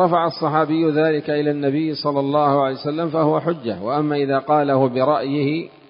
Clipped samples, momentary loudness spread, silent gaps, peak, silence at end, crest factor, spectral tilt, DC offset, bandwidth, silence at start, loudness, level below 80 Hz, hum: under 0.1%; 5 LU; none; -4 dBFS; 0.25 s; 16 dB; -11.5 dB/octave; under 0.1%; 5.4 kHz; 0 s; -19 LUFS; -64 dBFS; none